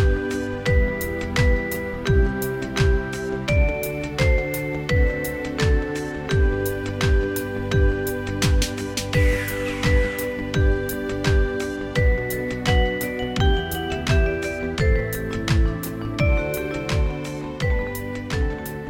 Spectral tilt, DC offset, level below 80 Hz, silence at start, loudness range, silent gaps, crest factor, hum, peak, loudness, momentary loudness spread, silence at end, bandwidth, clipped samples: -5.5 dB/octave; under 0.1%; -26 dBFS; 0 s; 1 LU; none; 14 dB; none; -6 dBFS; -23 LUFS; 6 LU; 0 s; 18 kHz; under 0.1%